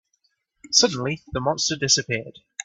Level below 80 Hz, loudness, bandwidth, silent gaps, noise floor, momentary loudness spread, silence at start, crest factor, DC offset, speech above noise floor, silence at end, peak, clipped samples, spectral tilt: -54 dBFS; -21 LUFS; 8.8 kHz; none; -70 dBFS; 11 LU; 0.65 s; 24 dB; under 0.1%; 47 dB; 0 s; 0 dBFS; under 0.1%; -2 dB/octave